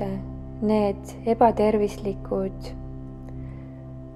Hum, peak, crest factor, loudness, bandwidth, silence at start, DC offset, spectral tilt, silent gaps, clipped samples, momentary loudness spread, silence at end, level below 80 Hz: none; -4 dBFS; 20 dB; -24 LUFS; 12.5 kHz; 0 s; under 0.1%; -7.5 dB/octave; none; under 0.1%; 19 LU; 0 s; -40 dBFS